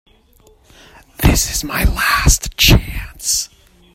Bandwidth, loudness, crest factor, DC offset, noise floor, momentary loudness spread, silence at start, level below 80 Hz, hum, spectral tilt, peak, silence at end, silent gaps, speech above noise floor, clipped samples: 16.5 kHz; -14 LUFS; 16 dB; under 0.1%; -50 dBFS; 9 LU; 1.2 s; -22 dBFS; none; -3 dB/octave; 0 dBFS; 0.5 s; none; 36 dB; under 0.1%